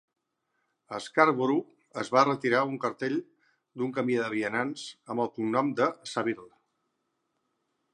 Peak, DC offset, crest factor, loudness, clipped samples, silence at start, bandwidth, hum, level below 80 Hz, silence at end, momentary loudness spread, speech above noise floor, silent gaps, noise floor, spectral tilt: -6 dBFS; under 0.1%; 26 dB; -28 LUFS; under 0.1%; 0.9 s; 11 kHz; none; -80 dBFS; 1.45 s; 14 LU; 51 dB; none; -79 dBFS; -5.5 dB/octave